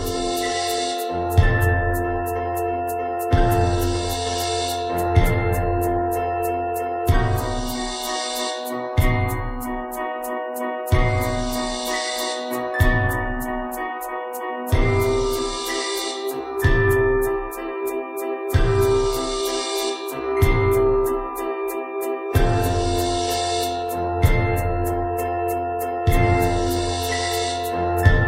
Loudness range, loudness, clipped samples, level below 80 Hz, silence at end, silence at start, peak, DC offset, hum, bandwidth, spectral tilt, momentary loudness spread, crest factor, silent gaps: 3 LU; -22 LUFS; under 0.1%; -28 dBFS; 0 s; 0 s; -2 dBFS; under 0.1%; none; 16 kHz; -5 dB/octave; 8 LU; 18 dB; none